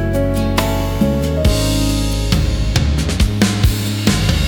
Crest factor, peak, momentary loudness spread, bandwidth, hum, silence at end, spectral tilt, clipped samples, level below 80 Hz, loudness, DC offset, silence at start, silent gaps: 14 dB; 0 dBFS; 2 LU; over 20 kHz; none; 0 s; -5.5 dB/octave; under 0.1%; -20 dBFS; -16 LUFS; under 0.1%; 0 s; none